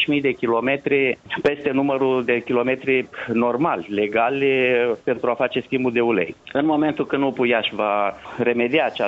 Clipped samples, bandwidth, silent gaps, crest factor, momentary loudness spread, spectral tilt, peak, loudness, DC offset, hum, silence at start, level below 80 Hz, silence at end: under 0.1%; 7.6 kHz; none; 14 dB; 4 LU; -7 dB/octave; -6 dBFS; -21 LUFS; under 0.1%; none; 0 s; -58 dBFS; 0 s